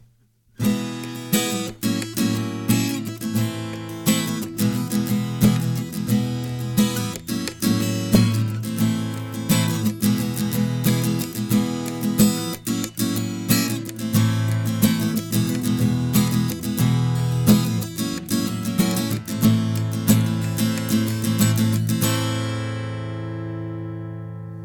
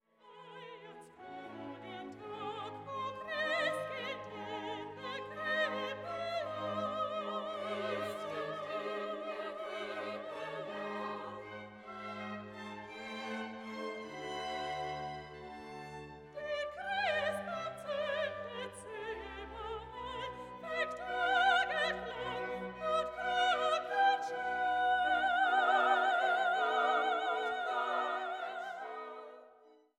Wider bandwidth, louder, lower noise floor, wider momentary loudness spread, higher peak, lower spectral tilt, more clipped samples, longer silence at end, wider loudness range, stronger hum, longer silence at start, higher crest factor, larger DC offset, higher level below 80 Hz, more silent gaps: first, 19.5 kHz vs 13 kHz; first, -22 LUFS vs -36 LUFS; second, -59 dBFS vs -63 dBFS; second, 9 LU vs 16 LU; first, -4 dBFS vs -18 dBFS; first, -5.5 dB/octave vs -3.5 dB/octave; neither; second, 0 s vs 0.25 s; second, 3 LU vs 12 LU; neither; first, 0.6 s vs 0.25 s; about the same, 18 dB vs 20 dB; neither; first, -48 dBFS vs -68 dBFS; neither